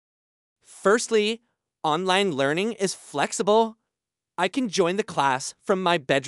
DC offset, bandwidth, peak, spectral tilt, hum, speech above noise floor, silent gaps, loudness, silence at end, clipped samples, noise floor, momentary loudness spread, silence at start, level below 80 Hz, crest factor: under 0.1%; 12 kHz; -6 dBFS; -3.5 dB/octave; none; 64 dB; none; -24 LUFS; 0 s; under 0.1%; -87 dBFS; 7 LU; 0.7 s; -76 dBFS; 18 dB